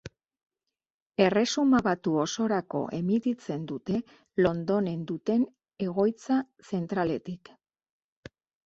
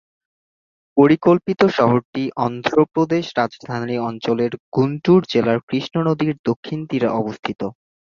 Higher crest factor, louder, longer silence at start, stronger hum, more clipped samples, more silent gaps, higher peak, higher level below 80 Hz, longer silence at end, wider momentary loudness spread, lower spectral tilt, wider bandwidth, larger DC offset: about the same, 22 dB vs 18 dB; second, -28 LUFS vs -19 LUFS; second, 0.05 s vs 0.95 s; neither; neither; second, 0.90-1.10 s vs 2.05-2.13 s, 4.60-4.72 s, 5.63-5.68 s, 6.39-6.44 s, 6.56-6.63 s, 7.39-7.43 s; second, -8 dBFS vs -2 dBFS; about the same, -62 dBFS vs -58 dBFS; first, 1.3 s vs 0.45 s; about the same, 11 LU vs 10 LU; second, -6 dB/octave vs -7.5 dB/octave; first, 8 kHz vs 7.2 kHz; neither